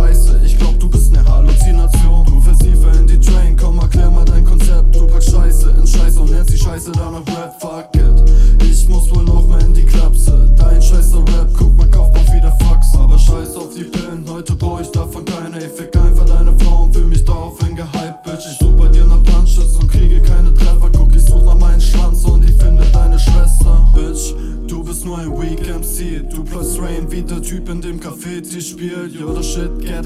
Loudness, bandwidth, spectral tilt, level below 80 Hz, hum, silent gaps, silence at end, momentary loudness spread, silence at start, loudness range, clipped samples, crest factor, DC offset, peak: -14 LUFS; 13 kHz; -6 dB/octave; -8 dBFS; none; none; 0 s; 12 LU; 0 s; 10 LU; under 0.1%; 8 dB; under 0.1%; 0 dBFS